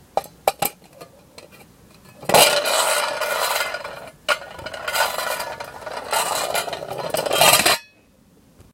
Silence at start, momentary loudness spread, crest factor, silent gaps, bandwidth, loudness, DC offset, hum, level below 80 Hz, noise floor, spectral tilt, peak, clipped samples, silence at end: 0.15 s; 17 LU; 22 dB; none; 17 kHz; -19 LUFS; under 0.1%; none; -56 dBFS; -54 dBFS; -0.5 dB/octave; 0 dBFS; under 0.1%; 0.9 s